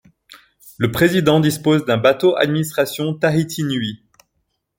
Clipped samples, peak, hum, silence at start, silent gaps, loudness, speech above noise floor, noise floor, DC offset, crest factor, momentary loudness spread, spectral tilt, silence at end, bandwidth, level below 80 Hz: under 0.1%; -2 dBFS; none; 0.3 s; none; -17 LUFS; 54 dB; -71 dBFS; under 0.1%; 16 dB; 7 LU; -5.5 dB/octave; 0.85 s; 17 kHz; -52 dBFS